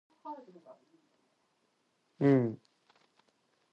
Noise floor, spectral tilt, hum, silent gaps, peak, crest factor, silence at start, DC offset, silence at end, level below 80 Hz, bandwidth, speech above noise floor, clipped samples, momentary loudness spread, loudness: -76 dBFS; -10 dB/octave; none; none; -16 dBFS; 20 dB; 0.25 s; under 0.1%; 1.15 s; -82 dBFS; 5.8 kHz; 45 dB; under 0.1%; 22 LU; -29 LUFS